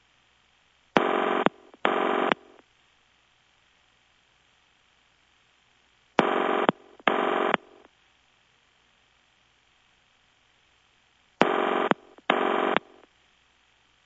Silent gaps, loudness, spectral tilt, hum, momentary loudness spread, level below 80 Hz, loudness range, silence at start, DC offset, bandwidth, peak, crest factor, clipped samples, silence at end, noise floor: none; -26 LUFS; -5.5 dB/octave; none; 5 LU; -76 dBFS; 6 LU; 0.95 s; under 0.1%; 8 kHz; 0 dBFS; 30 dB; under 0.1%; 1.25 s; -64 dBFS